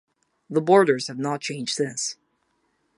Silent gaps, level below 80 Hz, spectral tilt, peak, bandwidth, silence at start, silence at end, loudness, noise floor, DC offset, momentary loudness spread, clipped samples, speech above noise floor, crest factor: none; -76 dBFS; -4 dB/octave; -4 dBFS; 11.5 kHz; 0.5 s; 0.85 s; -23 LUFS; -70 dBFS; under 0.1%; 12 LU; under 0.1%; 48 dB; 22 dB